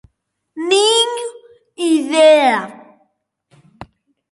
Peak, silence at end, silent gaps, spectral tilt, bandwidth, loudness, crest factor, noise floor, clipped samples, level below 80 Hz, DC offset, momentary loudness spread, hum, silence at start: 0 dBFS; 0.45 s; none; -2 dB/octave; 11.5 kHz; -14 LUFS; 16 dB; -68 dBFS; under 0.1%; -62 dBFS; under 0.1%; 19 LU; none; 0.55 s